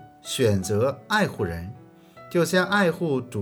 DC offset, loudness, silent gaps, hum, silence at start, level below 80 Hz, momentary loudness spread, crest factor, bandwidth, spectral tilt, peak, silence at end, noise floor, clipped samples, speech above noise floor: under 0.1%; -24 LUFS; none; none; 0 s; -58 dBFS; 9 LU; 16 dB; over 20 kHz; -5 dB/octave; -8 dBFS; 0 s; -48 dBFS; under 0.1%; 24 dB